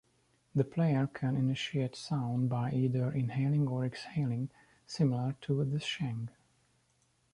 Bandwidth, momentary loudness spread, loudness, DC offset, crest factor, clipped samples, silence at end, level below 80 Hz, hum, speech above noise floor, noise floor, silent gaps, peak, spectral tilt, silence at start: 11 kHz; 6 LU; -33 LUFS; under 0.1%; 18 dB; under 0.1%; 1.05 s; -68 dBFS; none; 41 dB; -73 dBFS; none; -16 dBFS; -7 dB/octave; 0.55 s